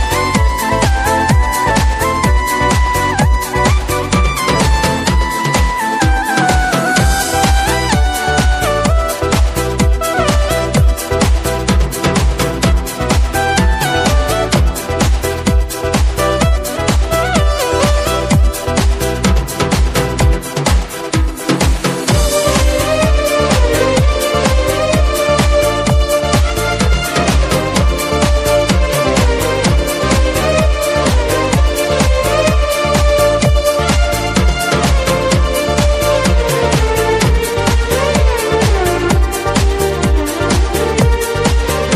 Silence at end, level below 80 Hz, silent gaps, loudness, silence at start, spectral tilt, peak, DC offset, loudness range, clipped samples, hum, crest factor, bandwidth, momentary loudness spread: 0 s; -16 dBFS; none; -13 LUFS; 0 s; -4.5 dB/octave; 0 dBFS; under 0.1%; 2 LU; under 0.1%; none; 12 dB; 15.5 kHz; 3 LU